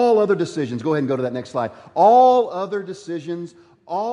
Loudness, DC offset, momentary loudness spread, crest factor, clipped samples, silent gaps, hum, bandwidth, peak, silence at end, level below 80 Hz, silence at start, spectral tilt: -19 LUFS; under 0.1%; 17 LU; 16 dB; under 0.1%; none; none; 10.5 kHz; -4 dBFS; 0 s; -68 dBFS; 0 s; -6.5 dB/octave